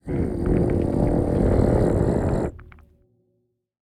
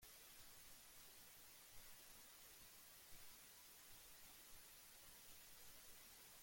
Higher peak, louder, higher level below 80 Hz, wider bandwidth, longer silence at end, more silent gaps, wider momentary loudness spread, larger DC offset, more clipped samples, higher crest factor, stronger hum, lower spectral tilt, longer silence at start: first, -8 dBFS vs -48 dBFS; first, -22 LUFS vs -61 LUFS; first, -30 dBFS vs -78 dBFS; second, 11.5 kHz vs 17 kHz; first, 1.25 s vs 0 s; neither; first, 6 LU vs 1 LU; neither; neither; about the same, 16 dB vs 16 dB; neither; first, -9.5 dB/octave vs -0.5 dB/octave; about the same, 0.05 s vs 0 s